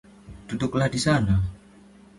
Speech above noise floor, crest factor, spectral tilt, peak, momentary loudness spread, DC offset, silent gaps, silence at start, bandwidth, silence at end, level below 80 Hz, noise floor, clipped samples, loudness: 28 dB; 16 dB; -6 dB/octave; -10 dBFS; 13 LU; under 0.1%; none; 0.25 s; 11.5 kHz; 0.6 s; -40 dBFS; -51 dBFS; under 0.1%; -24 LUFS